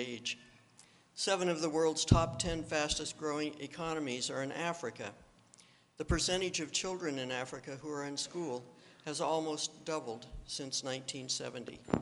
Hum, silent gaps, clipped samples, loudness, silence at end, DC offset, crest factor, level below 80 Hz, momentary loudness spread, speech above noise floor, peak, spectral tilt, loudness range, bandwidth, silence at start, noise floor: none; none; under 0.1%; -36 LUFS; 0 s; under 0.1%; 26 dB; -52 dBFS; 12 LU; 27 dB; -10 dBFS; -3.5 dB/octave; 5 LU; 11.5 kHz; 0 s; -64 dBFS